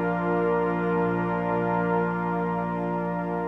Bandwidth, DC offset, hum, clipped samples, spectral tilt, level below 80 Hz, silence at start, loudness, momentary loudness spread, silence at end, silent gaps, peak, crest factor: 4.3 kHz; under 0.1%; 60 Hz at -55 dBFS; under 0.1%; -10 dB/octave; -50 dBFS; 0 s; -26 LUFS; 4 LU; 0 s; none; -14 dBFS; 12 dB